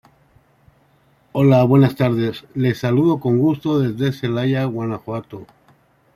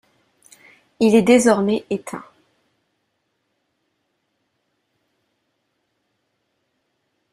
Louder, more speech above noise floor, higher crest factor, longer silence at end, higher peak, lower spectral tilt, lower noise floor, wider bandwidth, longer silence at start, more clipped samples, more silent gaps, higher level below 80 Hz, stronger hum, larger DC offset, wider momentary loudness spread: about the same, -18 LUFS vs -17 LUFS; second, 40 dB vs 56 dB; second, 16 dB vs 22 dB; second, 0.7 s vs 5.1 s; about the same, -2 dBFS vs -2 dBFS; first, -8.5 dB/octave vs -5 dB/octave; second, -57 dBFS vs -72 dBFS; first, 14.5 kHz vs 13 kHz; first, 1.35 s vs 1 s; neither; neither; first, -56 dBFS vs -64 dBFS; neither; neither; second, 14 LU vs 18 LU